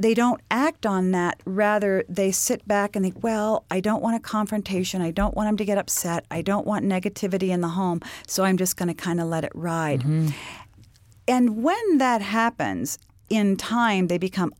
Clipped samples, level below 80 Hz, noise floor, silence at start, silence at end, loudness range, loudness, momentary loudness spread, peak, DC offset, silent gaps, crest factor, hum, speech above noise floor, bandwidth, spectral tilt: under 0.1%; -46 dBFS; -52 dBFS; 0 s; 0.05 s; 2 LU; -24 LUFS; 6 LU; -6 dBFS; under 0.1%; none; 16 dB; none; 29 dB; 17 kHz; -5 dB/octave